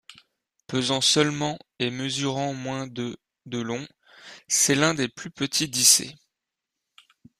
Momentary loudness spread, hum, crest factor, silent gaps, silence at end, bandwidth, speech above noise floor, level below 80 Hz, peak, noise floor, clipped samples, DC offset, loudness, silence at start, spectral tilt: 16 LU; none; 24 dB; none; 1.25 s; 15.5 kHz; 60 dB; -64 dBFS; -2 dBFS; -85 dBFS; under 0.1%; under 0.1%; -23 LUFS; 0.1 s; -2.5 dB/octave